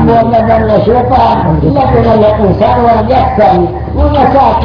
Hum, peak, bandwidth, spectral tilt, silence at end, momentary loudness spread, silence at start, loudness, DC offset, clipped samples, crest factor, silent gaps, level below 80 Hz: none; 0 dBFS; 5.4 kHz; -9.5 dB/octave; 0 s; 3 LU; 0 s; -8 LUFS; under 0.1%; 1%; 6 dB; none; -20 dBFS